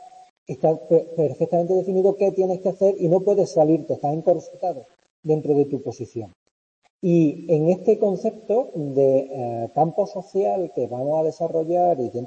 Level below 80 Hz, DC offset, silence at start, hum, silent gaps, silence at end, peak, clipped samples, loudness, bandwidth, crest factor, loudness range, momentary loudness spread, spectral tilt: -70 dBFS; under 0.1%; 0 s; none; 0.30-0.46 s, 5.10-5.23 s, 6.36-6.82 s, 6.90-7.00 s; 0 s; -6 dBFS; under 0.1%; -22 LUFS; 8.6 kHz; 14 dB; 4 LU; 10 LU; -9 dB/octave